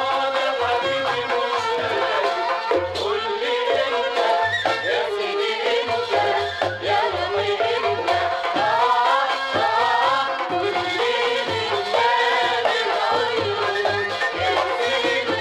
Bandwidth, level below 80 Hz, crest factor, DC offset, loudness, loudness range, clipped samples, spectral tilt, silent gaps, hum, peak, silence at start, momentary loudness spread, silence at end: 13 kHz; -58 dBFS; 14 dB; under 0.1%; -21 LUFS; 2 LU; under 0.1%; -3 dB/octave; none; none; -6 dBFS; 0 s; 4 LU; 0 s